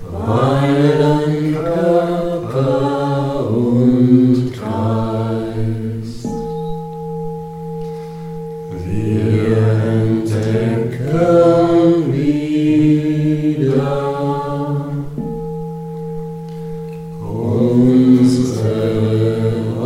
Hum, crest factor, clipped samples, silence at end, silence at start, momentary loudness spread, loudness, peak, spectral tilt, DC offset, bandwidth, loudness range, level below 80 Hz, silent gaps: none; 16 dB; under 0.1%; 0 s; 0 s; 15 LU; -16 LUFS; 0 dBFS; -8.5 dB/octave; under 0.1%; 12 kHz; 9 LU; -42 dBFS; none